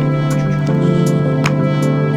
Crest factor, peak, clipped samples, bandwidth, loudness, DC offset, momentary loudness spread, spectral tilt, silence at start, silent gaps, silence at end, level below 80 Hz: 14 dB; 0 dBFS; under 0.1%; 12 kHz; -15 LUFS; under 0.1%; 2 LU; -7.5 dB/octave; 0 s; none; 0 s; -44 dBFS